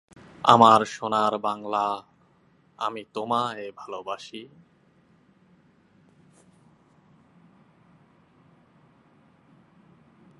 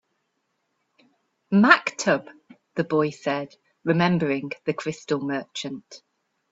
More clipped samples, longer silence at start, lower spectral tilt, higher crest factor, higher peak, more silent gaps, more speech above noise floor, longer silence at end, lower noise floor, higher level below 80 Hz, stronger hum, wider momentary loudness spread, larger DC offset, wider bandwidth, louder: neither; second, 0.45 s vs 1.5 s; about the same, -5 dB/octave vs -5.5 dB/octave; about the same, 28 dB vs 26 dB; about the same, 0 dBFS vs 0 dBFS; neither; second, 38 dB vs 52 dB; first, 5.95 s vs 0.55 s; second, -62 dBFS vs -75 dBFS; about the same, -72 dBFS vs -68 dBFS; neither; first, 21 LU vs 16 LU; neither; first, 11.5 kHz vs 8 kHz; about the same, -23 LUFS vs -23 LUFS